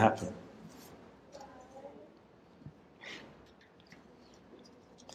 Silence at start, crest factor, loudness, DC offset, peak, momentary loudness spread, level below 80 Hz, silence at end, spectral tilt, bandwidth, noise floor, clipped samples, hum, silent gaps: 0 s; 30 dB; -43 LUFS; under 0.1%; -10 dBFS; 13 LU; -70 dBFS; 0 s; -6 dB/octave; 15.5 kHz; -60 dBFS; under 0.1%; none; none